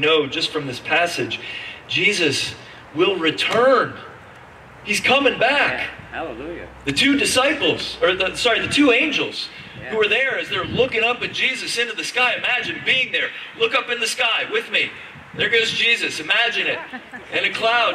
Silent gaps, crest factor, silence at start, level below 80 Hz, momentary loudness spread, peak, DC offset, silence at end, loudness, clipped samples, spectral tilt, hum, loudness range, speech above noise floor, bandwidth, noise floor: none; 16 dB; 0 s; -54 dBFS; 14 LU; -4 dBFS; under 0.1%; 0 s; -19 LUFS; under 0.1%; -2.5 dB/octave; none; 2 LU; 22 dB; 15 kHz; -42 dBFS